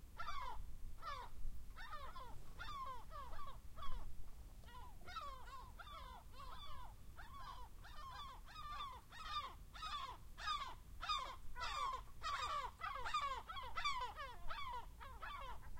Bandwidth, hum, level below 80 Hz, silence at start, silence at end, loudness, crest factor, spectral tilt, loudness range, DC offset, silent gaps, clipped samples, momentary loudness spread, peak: 16.5 kHz; none; -54 dBFS; 0 s; 0 s; -49 LUFS; 18 dB; -2.5 dB/octave; 10 LU; under 0.1%; none; under 0.1%; 14 LU; -28 dBFS